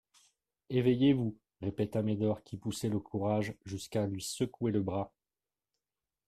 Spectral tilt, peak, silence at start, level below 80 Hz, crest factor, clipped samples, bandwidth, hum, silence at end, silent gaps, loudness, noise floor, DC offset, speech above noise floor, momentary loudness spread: -6.5 dB/octave; -16 dBFS; 0.7 s; -64 dBFS; 18 dB; under 0.1%; 14.5 kHz; none; 1.2 s; none; -34 LUFS; under -90 dBFS; under 0.1%; over 58 dB; 11 LU